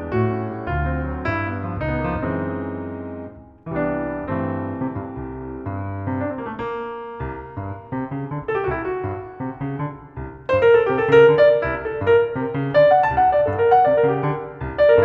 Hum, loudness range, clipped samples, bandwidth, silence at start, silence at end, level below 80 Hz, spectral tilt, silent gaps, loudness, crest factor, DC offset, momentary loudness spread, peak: none; 11 LU; under 0.1%; 6.2 kHz; 0 s; 0 s; -38 dBFS; -9 dB/octave; none; -20 LUFS; 18 dB; under 0.1%; 16 LU; -2 dBFS